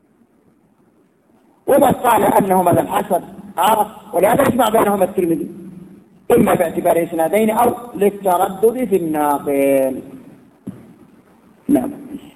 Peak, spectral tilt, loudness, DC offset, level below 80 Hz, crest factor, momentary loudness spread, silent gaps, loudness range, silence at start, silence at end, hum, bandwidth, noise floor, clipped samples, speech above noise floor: -2 dBFS; -5.5 dB/octave; -16 LUFS; under 0.1%; -50 dBFS; 16 dB; 16 LU; none; 4 LU; 1.65 s; 0.05 s; none; 15.5 kHz; -55 dBFS; under 0.1%; 40 dB